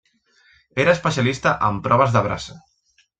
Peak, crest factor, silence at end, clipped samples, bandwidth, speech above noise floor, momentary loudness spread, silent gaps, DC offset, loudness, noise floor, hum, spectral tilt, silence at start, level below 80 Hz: -4 dBFS; 18 dB; 0.6 s; under 0.1%; 9 kHz; 44 dB; 13 LU; none; under 0.1%; -19 LUFS; -63 dBFS; none; -5.5 dB/octave; 0.75 s; -50 dBFS